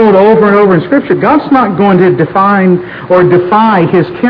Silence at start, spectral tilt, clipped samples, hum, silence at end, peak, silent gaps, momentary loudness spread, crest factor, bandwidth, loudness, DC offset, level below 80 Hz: 0 s; -10 dB/octave; 3%; none; 0 s; 0 dBFS; none; 5 LU; 6 dB; 5.4 kHz; -7 LUFS; under 0.1%; -44 dBFS